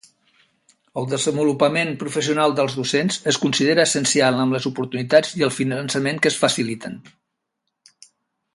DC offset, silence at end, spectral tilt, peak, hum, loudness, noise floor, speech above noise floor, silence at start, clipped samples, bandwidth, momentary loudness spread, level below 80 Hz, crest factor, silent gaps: under 0.1%; 1.55 s; -4 dB/octave; 0 dBFS; none; -20 LUFS; -78 dBFS; 58 dB; 0.95 s; under 0.1%; 11.5 kHz; 9 LU; -64 dBFS; 20 dB; none